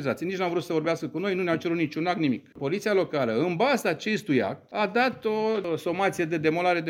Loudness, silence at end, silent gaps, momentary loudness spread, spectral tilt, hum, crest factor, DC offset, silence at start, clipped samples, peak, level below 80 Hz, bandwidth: -26 LUFS; 0 s; none; 5 LU; -6 dB/octave; none; 18 dB; under 0.1%; 0 s; under 0.1%; -8 dBFS; -70 dBFS; 16.5 kHz